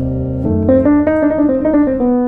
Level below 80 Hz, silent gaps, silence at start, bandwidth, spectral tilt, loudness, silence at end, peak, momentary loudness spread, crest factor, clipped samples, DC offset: -32 dBFS; none; 0 s; 3.3 kHz; -12 dB/octave; -13 LUFS; 0 s; -2 dBFS; 6 LU; 12 dB; under 0.1%; under 0.1%